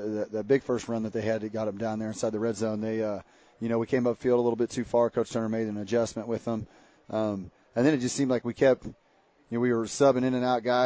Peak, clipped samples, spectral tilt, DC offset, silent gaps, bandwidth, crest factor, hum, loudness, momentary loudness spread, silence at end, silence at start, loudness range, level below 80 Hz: -10 dBFS; under 0.1%; -6 dB/octave; under 0.1%; none; 8 kHz; 18 dB; none; -28 LUFS; 9 LU; 0 s; 0 s; 3 LU; -60 dBFS